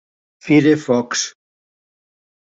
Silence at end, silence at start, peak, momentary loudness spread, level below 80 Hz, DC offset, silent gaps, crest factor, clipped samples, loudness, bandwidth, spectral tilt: 1.2 s; 0.45 s; -2 dBFS; 13 LU; -62 dBFS; under 0.1%; none; 18 dB; under 0.1%; -16 LUFS; 7.8 kHz; -4.5 dB/octave